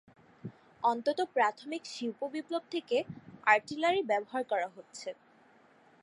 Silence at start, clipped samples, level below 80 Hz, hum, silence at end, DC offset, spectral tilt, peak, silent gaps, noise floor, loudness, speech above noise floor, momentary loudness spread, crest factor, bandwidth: 0.45 s; under 0.1%; -78 dBFS; none; 0.9 s; under 0.1%; -4 dB/octave; -12 dBFS; none; -62 dBFS; -32 LUFS; 30 dB; 18 LU; 22 dB; 11.5 kHz